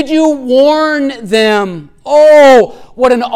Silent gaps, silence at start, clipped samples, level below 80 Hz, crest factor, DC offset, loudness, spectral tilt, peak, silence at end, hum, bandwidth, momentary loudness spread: none; 0 s; under 0.1%; -46 dBFS; 8 dB; under 0.1%; -8 LUFS; -4.5 dB/octave; 0 dBFS; 0 s; none; 13.5 kHz; 12 LU